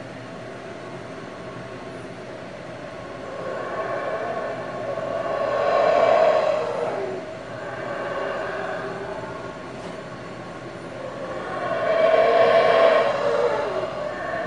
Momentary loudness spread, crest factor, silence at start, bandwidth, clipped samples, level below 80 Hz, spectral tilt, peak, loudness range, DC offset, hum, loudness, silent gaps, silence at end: 19 LU; 20 dB; 0 s; 11 kHz; under 0.1%; -58 dBFS; -5 dB/octave; -4 dBFS; 12 LU; 0.2%; none; -23 LUFS; none; 0 s